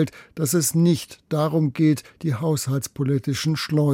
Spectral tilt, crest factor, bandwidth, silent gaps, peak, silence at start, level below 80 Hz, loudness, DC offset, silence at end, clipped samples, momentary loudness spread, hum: -5.5 dB/octave; 14 dB; 16.5 kHz; none; -8 dBFS; 0 s; -60 dBFS; -22 LUFS; under 0.1%; 0 s; under 0.1%; 7 LU; none